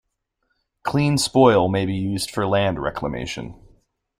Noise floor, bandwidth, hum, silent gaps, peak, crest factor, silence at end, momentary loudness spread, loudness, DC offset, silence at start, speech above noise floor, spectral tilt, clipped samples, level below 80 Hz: -73 dBFS; 16 kHz; none; none; -2 dBFS; 20 dB; 0.65 s; 15 LU; -20 LUFS; under 0.1%; 0.85 s; 53 dB; -5.5 dB/octave; under 0.1%; -48 dBFS